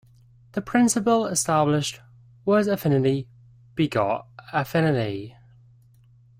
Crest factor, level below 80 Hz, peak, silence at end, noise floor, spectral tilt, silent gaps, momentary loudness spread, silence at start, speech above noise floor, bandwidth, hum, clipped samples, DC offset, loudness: 16 dB; -58 dBFS; -8 dBFS; 1.1 s; -55 dBFS; -5 dB/octave; none; 13 LU; 0.55 s; 32 dB; 16 kHz; none; under 0.1%; under 0.1%; -23 LUFS